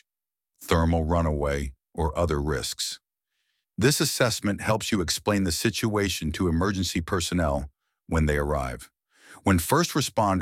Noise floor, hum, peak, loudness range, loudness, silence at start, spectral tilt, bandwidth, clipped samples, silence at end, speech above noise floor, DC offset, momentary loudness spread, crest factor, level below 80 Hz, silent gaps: under -90 dBFS; none; -6 dBFS; 2 LU; -25 LUFS; 0.6 s; -4.5 dB/octave; 17 kHz; under 0.1%; 0 s; over 65 dB; under 0.1%; 9 LU; 20 dB; -38 dBFS; none